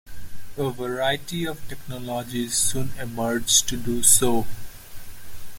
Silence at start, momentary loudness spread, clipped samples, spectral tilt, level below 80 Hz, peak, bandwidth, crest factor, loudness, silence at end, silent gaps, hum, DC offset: 0.05 s; 22 LU; under 0.1%; -2.5 dB/octave; -42 dBFS; 0 dBFS; 17 kHz; 22 dB; -22 LUFS; 0 s; none; none; under 0.1%